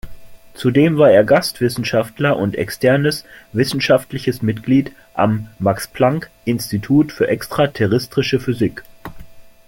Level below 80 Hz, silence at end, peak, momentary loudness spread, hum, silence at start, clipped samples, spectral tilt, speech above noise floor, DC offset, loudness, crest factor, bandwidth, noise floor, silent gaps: -46 dBFS; 0.2 s; -2 dBFS; 10 LU; none; 0.05 s; under 0.1%; -6 dB/octave; 20 dB; under 0.1%; -17 LUFS; 16 dB; 17 kHz; -37 dBFS; none